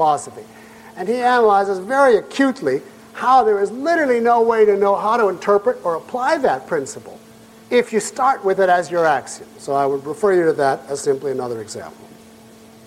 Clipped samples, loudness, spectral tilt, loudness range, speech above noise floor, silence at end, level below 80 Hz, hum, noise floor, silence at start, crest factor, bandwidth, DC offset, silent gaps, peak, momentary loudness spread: under 0.1%; -17 LUFS; -4.5 dB/octave; 4 LU; 27 dB; 0.95 s; -60 dBFS; none; -44 dBFS; 0 s; 14 dB; 15 kHz; under 0.1%; none; -4 dBFS; 13 LU